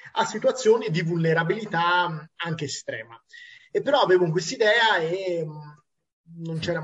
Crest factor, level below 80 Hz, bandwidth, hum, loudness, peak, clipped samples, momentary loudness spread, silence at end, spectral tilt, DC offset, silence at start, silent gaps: 16 dB; -66 dBFS; 8.2 kHz; none; -23 LUFS; -8 dBFS; under 0.1%; 15 LU; 0 s; -4.5 dB/octave; under 0.1%; 0.05 s; 6.13-6.24 s